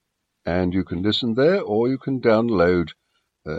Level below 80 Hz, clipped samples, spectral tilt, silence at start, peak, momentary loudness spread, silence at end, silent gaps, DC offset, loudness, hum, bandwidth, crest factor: -50 dBFS; under 0.1%; -7.5 dB/octave; 0.45 s; -6 dBFS; 9 LU; 0 s; none; under 0.1%; -21 LUFS; none; 7.8 kHz; 16 dB